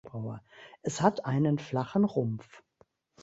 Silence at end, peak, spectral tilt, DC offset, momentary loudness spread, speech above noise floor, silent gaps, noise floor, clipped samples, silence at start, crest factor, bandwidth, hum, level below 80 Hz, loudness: 0.65 s; -8 dBFS; -7 dB/octave; under 0.1%; 13 LU; 37 dB; none; -67 dBFS; under 0.1%; 0.05 s; 22 dB; 8 kHz; none; -66 dBFS; -30 LUFS